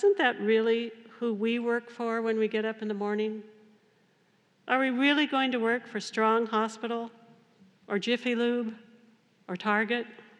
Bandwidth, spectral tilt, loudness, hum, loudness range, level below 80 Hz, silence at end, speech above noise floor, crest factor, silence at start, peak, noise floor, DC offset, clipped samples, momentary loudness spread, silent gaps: 10 kHz; -5 dB/octave; -28 LUFS; none; 4 LU; under -90 dBFS; 0.2 s; 39 dB; 20 dB; 0 s; -10 dBFS; -67 dBFS; under 0.1%; under 0.1%; 10 LU; none